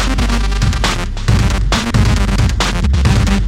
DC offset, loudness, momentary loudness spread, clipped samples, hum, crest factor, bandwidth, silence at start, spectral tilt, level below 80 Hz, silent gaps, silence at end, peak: under 0.1%; -15 LUFS; 3 LU; under 0.1%; none; 12 dB; 14.5 kHz; 0 s; -5 dB/octave; -16 dBFS; none; 0 s; 0 dBFS